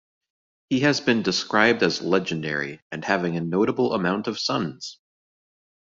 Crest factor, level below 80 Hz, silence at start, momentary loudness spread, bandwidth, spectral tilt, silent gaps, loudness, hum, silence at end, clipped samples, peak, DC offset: 22 dB; -64 dBFS; 0.7 s; 11 LU; 7.8 kHz; -4.5 dB/octave; 2.82-2.90 s; -23 LUFS; none; 0.95 s; under 0.1%; -2 dBFS; under 0.1%